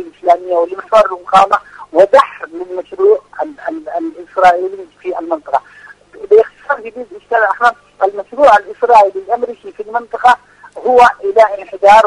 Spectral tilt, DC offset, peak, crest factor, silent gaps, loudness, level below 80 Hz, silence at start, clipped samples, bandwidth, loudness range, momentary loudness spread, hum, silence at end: -3.5 dB/octave; under 0.1%; 0 dBFS; 12 dB; none; -12 LUFS; -52 dBFS; 0 s; 0.5%; 11 kHz; 4 LU; 14 LU; 50 Hz at -60 dBFS; 0 s